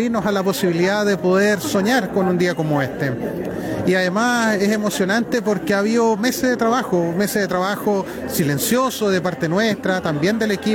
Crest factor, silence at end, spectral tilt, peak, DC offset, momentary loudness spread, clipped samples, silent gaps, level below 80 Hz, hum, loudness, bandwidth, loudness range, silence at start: 12 dB; 0 s; -5 dB/octave; -8 dBFS; under 0.1%; 4 LU; under 0.1%; none; -52 dBFS; none; -19 LUFS; 19 kHz; 1 LU; 0 s